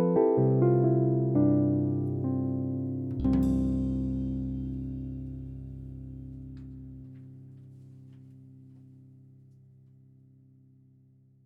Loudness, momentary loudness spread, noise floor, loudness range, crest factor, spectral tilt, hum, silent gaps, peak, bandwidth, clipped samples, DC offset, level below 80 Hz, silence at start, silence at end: -28 LUFS; 24 LU; -60 dBFS; 22 LU; 18 dB; -12 dB/octave; 50 Hz at -65 dBFS; none; -12 dBFS; 3.5 kHz; under 0.1%; under 0.1%; -44 dBFS; 0 s; 2.8 s